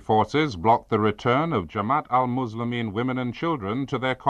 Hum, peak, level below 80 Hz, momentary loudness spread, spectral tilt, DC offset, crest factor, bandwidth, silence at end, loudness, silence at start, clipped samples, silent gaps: none; -6 dBFS; -54 dBFS; 6 LU; -7 dB/octave; under 0.1%; 18 dB; 9.4 kHz; 0 s; -24 LUFS; 0 s; under 0.1%; none